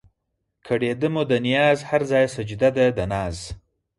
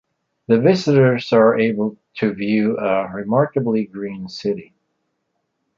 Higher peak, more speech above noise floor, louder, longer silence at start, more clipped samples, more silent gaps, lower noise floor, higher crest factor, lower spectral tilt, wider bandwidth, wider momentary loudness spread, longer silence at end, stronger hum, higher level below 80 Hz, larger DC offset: second, -6 dBFS vs -2 dBFS; about the same, 56 dB vs 55 dB; second, -21 LUFS vs -18 LUFS; first, 0.65 s vs 0.5 s; neither; neither; first, -77 dBFS vs -73 dBFS; about the same, 16 dB vs 16 dB; second, -6 dB/octave vs -7.5 dB/octave; first, 11.5 kHz vs 7.4 kHz; about the same, 11 LU vs 11 LU; second, 0.4 s vs 1.15 s; neither; first, -46 dBFS vs -60 dBFS; neither